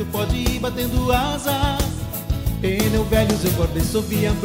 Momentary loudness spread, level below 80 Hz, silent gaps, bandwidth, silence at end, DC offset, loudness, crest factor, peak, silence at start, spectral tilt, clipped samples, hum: 6 LU; -28 dBFS; none; 16.5 kHz; 0 s; under 0.1%; -21 LUFS; 14 dB; -6 dBFS; 0 s; -5.5 dB/octave; under 0.1%; none